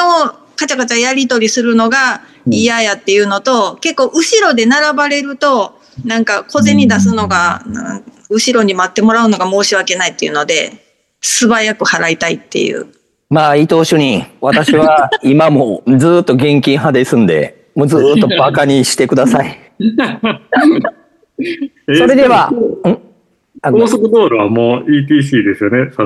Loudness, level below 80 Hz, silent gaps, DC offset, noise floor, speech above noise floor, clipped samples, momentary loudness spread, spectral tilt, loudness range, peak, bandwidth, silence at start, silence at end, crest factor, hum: -11 LUFS; -52 dBFS; none; under 0.1%; -44 dBFS; 33 dB; under 0.1%; 9 LU; -4.5 dB/octave; 3 LU; 0 dBFS; 12.5 kHz; 0 s; 0 s; 12 dB; none